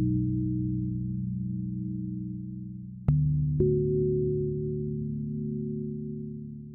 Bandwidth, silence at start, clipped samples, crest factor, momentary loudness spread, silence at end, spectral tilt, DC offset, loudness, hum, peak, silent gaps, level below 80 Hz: 1.5 kHz; 0 s; under 0.1%; 18 dB; 12 LU; 0 s; -15.5 dB/octave; under 0.1%; -30 LUFS; none; -10 dBFS; none; -44 dBFS